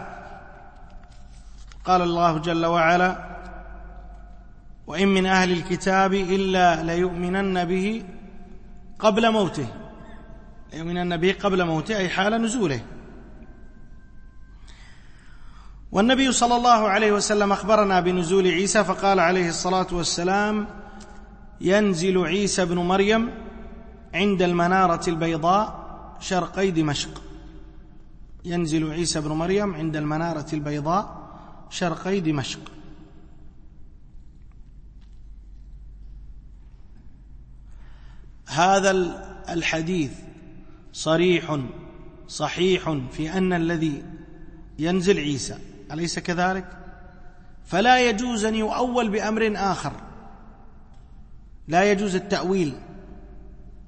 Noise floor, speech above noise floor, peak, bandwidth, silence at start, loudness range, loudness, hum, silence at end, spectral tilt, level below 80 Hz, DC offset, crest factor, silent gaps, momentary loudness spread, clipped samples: -44 dBFS; 22 dB; -4 dBFS; 8.8 kHz; 0 s; 7 LU; -22 LUFS; none; 0.1 s; -4.5 dB/octave; -44 dBFS; under 0.1%; 20 dB; none; 22 LU; under 0.1%